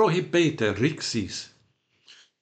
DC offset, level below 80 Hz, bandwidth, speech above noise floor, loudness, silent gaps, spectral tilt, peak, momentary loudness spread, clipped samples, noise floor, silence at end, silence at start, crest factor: under 0.1%; -64 dBFS; 9 kHz; 42 dB; -25 LUFS; none; -5 dB/octave; -10 dBFS; 13 LU; under 0.1%; -67 dBFS; 0.95 s; 0 s; 18 dB